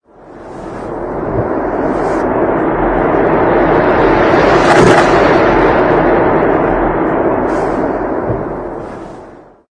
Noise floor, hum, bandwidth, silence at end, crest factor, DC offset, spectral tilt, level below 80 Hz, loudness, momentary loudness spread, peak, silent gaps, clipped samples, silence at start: -36 dBFS; none; 10.5 kHz; 0.35 s; 12 dB; under 0.1%; -6.5 dB/octave; -30 dBFS; -11 LUFS; 15 LU; 0 dBFS; none; under 0.1%; 0.25 s